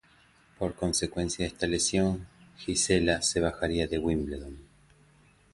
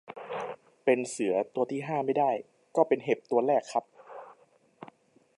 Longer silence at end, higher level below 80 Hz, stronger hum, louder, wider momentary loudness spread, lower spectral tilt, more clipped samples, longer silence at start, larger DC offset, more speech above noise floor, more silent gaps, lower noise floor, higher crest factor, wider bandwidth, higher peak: first, 0.9 s vs 0.55 s; first, -46 dBFS vs -84 dBFS; neither; about the same, -28 LUFS vs -29 LUFS; about the same, 12 LU vs 14 LU; second, -4 dB/octave vs -5.5 dB/octave; neither; first, 0.6 s vs 0.1 s; neither; about the same, 33 dB vs 35 dB; neither; about the same, -61 dBFS vs -63 dBFS; about the same, 20 dB vs 22 dB; about the same, 11.5 kHz vs 11.5 kHz; about the same, -10 dBFS vs -8 dBFS